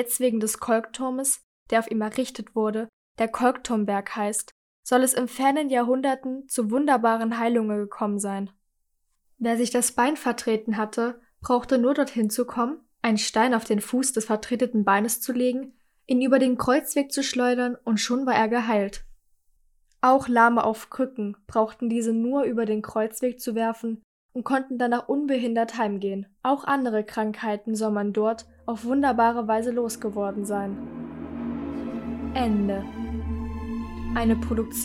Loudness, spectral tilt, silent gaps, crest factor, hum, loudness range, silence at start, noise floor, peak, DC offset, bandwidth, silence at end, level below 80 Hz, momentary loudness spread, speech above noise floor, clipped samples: -25 LUFS; -4 dB/octave; 1.43-1.66 s, 2.89-3.15 s, 4.52-4.83 s, 24.04-24.29 s; 20 dB; none; 4 LU; 0 s; -72 dBFS; -6 dBFS; under 0.1%; 17 kHz; 0 s; -48 dBFS; 11 LU; 48 dB; under 0.1%